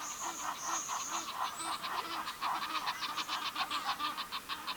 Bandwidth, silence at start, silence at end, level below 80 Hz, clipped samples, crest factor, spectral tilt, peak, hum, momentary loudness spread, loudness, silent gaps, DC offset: over 20 kHz; 0 s; 0 s; -72 dBFS; under 0.1%; 16 dB; 0.5 dB/octave; -22 dBFS; none; 3 LU; -37 LUFS; none; under 0.1%